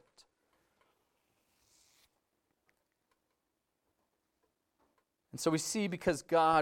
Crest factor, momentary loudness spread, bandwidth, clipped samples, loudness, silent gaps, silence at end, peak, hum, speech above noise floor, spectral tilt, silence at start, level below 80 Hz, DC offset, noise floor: 22 dB; 7 LU; 17 kHz; under 0.1%; -33 LUFS; none; 0 s; -16 dBFS; none; 53 dB; -4 dB/octave; 5.35 s; -68 dBFS; under 0.1%; -84 dBFS